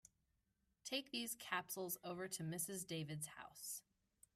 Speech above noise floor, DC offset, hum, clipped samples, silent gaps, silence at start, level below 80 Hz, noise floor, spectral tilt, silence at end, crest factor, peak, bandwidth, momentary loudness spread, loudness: 37 dB; under 0.1%; none; under 0.1%; none; 0.85 s; -84 dBFS; -85 dBFS; -3 dB/octave; 0.55 s; 20 dB; -28 dBFS; 16 kHz; 7 LU; -47 LUFS